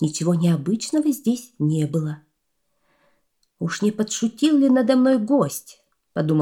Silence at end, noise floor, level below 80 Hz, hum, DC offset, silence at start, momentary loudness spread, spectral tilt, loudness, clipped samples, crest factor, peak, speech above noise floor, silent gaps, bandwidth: 0 s; -74 dBFS; -68 dBFS; none; under 0.1%; 0 s; 12 LU; -6 dB/octave; -21 LUFS; under 0.1%; 16 dB; -6 dBFS; 54 dB; none; 17.5 kHz